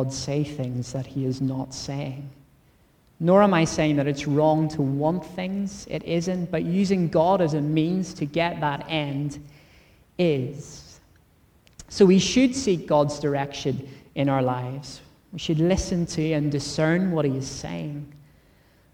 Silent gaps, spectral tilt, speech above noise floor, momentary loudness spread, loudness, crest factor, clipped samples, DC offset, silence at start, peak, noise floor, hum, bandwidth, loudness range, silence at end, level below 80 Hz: none; -6 dB/octave; 36 dB; 15 LU; -24 LUFS; 20 dB; under 0.1%; under 0.1%; 0 s; -4 dBFS; -59 dBFS; none; 11.5 kHz; 5 LU; 0.75 s; -48 dBFS